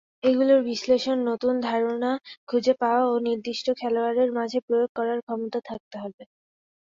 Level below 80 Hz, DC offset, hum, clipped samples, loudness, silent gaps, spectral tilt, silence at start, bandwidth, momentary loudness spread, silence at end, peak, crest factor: -70 dBFS; under 0.1%; none; under 0.1%; -24 LUFS; 2.37-2.47 s, 4.62-4.68 s, 4.89-4.95 s, 5.23-5.27 s, 5.80-5.91 s, 6.14-6.18 s; -4.5 dB/octave; 0.25 s; 7.6 kHz; 10 LU; 0.6 s; -10 dBFS; 16 dB